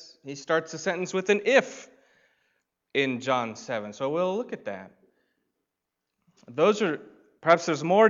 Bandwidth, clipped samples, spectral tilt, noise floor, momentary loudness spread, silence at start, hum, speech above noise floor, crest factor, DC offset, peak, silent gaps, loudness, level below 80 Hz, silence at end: 7.6 kHz; under 0.1%; -4.5 dB/octave; -84 dBFS; 16 LU; 0 s; none; 59 dB; 22 dB; under 0.1%; -6 dBFS; none; -26 LUFS; -80 dBFS; 0 s